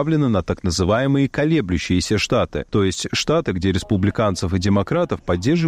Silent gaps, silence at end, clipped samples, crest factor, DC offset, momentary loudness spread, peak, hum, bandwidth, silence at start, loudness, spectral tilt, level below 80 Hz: none; 0 s; under 0.1%; 12 dB; under 0.1%; 3 LU; -8 dBFS; none; 14.5 kHz; 0 s; -20 LUFS; -5.5 dB/octave; -38 dBFS